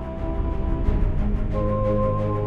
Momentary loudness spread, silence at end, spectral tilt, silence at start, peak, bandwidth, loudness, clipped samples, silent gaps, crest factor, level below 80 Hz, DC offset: 5 LU; 0 s; -10.5 dB/octave; 0 s; -10 dBFS; 4.2 kHz; -25 LUFS; under 0.1%; none; 12 dB; -24 dBFS; under 0.1%